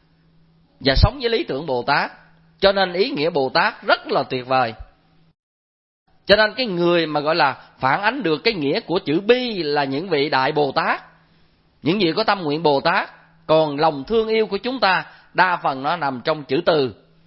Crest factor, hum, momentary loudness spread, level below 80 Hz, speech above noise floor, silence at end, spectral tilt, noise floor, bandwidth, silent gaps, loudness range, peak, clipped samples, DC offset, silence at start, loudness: 20 dB; none; 6 LU; -38 dBFS; 38 dB; 0.35 s; -8.5 dB/octave; -57 dBFS; 5.8 kHz; 5.39-6.06 s; 2 LU; 0 dBFS; under 0.1%; under 0.1%; 0.8 s; -20 LUFS